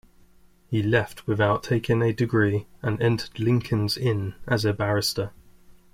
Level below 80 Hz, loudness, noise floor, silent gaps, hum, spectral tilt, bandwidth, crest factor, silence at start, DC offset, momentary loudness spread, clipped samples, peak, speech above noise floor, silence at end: -52 dBFS; -24 LUFS; -55 dBFS; none; none; -6 dB/octave; 16 kHz; 18 dB; 0.7 s; under 0.1%; 6 LU; under 0.1%; -6 dBFS; 31 dB; 0.2 s